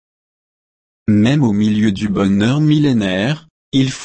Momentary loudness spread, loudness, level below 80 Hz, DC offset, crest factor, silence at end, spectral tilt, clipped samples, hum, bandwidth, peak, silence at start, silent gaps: 7 LU; -15 LUFS; -46 dBFS; under 0.1%; 12 dB; 0 s; -6.5 dB/octave; under 0.1%; none; 8.8 kHz; -4 dBFS; 1.1 s; 3.50-3.72 s